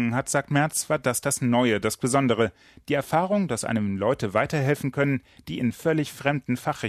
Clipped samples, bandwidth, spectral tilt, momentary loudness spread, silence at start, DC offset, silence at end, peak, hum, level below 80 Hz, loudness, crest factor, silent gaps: under 0.1%; 15 kHz; -5 dB/octave; 6 LU; 0 s; under 0.1%; 0 s; -6 dBFS; none; -56 dBFS; -25 LUFS; 18 dB; none